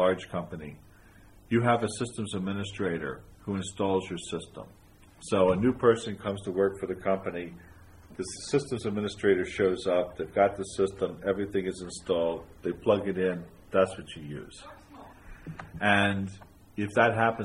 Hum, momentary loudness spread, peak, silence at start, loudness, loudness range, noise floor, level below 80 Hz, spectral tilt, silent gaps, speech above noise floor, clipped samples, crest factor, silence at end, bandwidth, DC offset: none; 18 LU; -6 dBFS; 0 s; -29 LUFS; 3 LU; -54 dBFS; -56 dBFS; -5.5 dB/octave; none; 25 dB; under 0.1%; 22 dB; 0 s; 12 kHz; under 0.1%